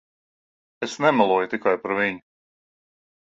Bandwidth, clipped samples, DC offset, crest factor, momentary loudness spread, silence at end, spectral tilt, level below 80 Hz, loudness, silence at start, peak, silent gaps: 7.8 kHz; under 0.1%; under 0.1%; 22 dB; 13 LU; 1.05 s; -5 dB/octave; -68 dBFS; -22 LUFS; 0.8 s; -4 dBFS; none